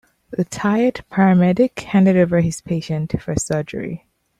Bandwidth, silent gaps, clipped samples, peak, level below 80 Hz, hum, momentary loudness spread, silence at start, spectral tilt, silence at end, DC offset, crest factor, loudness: 11.5 kHz; none; under 0.1%; -4 dBFS; -48 dBFS; none; 13 LU; 0.3 s; -7 dB/octave; 0.45 s; under 0.1%; 14 dB; -18 LUFS